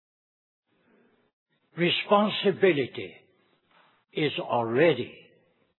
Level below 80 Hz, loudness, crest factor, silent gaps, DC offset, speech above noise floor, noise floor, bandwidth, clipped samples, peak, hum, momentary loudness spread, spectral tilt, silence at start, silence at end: -82 dBFS; -25 LUFS; 20 dB; none; under 0.1%; 41 dB; -66 dBFS; 4.2 kHz; under 0.1%; -8 dBFS; none; 16 LU; -9 dB/octave; 1.75 s; 0.65 s